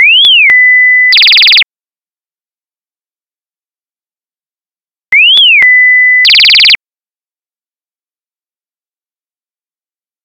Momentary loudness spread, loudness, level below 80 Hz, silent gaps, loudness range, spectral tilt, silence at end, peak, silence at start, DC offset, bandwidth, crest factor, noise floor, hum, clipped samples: 4 LU; -2 LUFS; -58 dBFS; none; 8 LU; 2.5 dB/octave; 3.5 s; 0 dBFS; 0 s; under 0.1%; over 20 kHz; 8 dB; under -90 dBFS; none; 0.6%